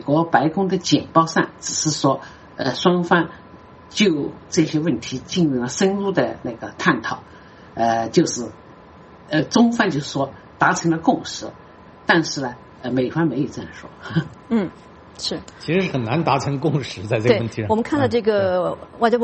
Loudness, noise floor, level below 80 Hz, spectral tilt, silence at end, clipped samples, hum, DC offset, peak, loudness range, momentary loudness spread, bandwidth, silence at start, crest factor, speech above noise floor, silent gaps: -20 LUFS; -44 dBFS; -54 dBFS; -5 dB/octave; 0 s; under 0.1%; none; under 0.1%; 0 dBFS; 4 LU; 11 LU; 8.4 kHz; 0 s; 20 dB; 24 dB; none